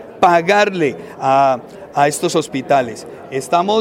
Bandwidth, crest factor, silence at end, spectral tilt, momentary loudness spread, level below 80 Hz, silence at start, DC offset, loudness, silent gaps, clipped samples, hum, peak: 16.5 kHz; 16 dB; 0 s; -4.5 dB/octave; 12 LU; -60 dBFS; 0 s; under 0.1%; -16 LUFS; none; under 0.1%; none; 0 dBFS